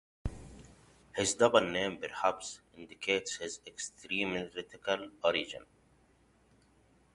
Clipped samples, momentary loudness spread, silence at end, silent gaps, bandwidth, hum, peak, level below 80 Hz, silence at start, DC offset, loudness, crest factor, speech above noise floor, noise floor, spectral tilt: under 0.1%; 17 LU; 1.5 s; none; 11.5 kHz; none; -10 dBFS; -56 dBFS; 0.25 s; under 0.1%; -34 LUFS; 26 dB; 34 dB; -67 dBFS; -3 dB/octave